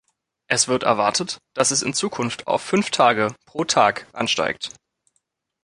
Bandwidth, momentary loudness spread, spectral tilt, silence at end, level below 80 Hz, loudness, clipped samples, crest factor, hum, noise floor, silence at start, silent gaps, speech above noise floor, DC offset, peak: 11.5 kHz; 9 LU; -2.5 dB/octave; 0.95 s; -62 dBFS; -21 LUFS; under 0.1%; 20 dB; none; -72 dBFS; 0.5 s; none; 51 dB; under 0.1%; -2 dBFS